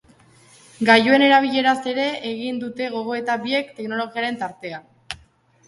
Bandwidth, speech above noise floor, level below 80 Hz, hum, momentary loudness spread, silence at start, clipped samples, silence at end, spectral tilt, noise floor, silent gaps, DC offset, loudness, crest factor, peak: 11.5 kHz; 35 dB; -62 dBFS; none; 21 LU; 0.8 s; under 0.1%; 0.5 s; -4.5 dB/octave; -55 dBFS; none; under 0.1%; -20 LUFS; 20 dB; 0 dBFS